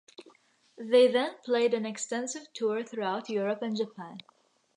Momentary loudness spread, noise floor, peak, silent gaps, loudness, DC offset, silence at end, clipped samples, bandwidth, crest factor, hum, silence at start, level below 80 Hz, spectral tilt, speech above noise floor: 17 LU; -63 dBFS; -10 dBFS; none; -29 LUFS; under 0.1%; 0.55 s; under 0.1%; 10.5 kHz; 20 dB; none; 0.2 s; -88 dBFS; -3.5 dB/octave; 34 dB